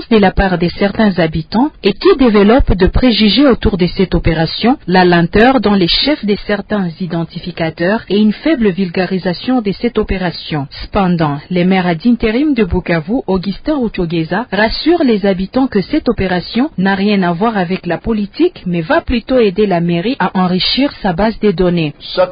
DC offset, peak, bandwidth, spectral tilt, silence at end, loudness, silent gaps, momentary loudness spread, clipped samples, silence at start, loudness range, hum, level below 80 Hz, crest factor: under 0.1%; 0 dBFS; 5.2 kHz; -9.5 dB/octave; 0 s; -13 LUFS; none; 8 LU; under 0.1%; 0 s; 4 LU; none; -28 dBFS; 12 dB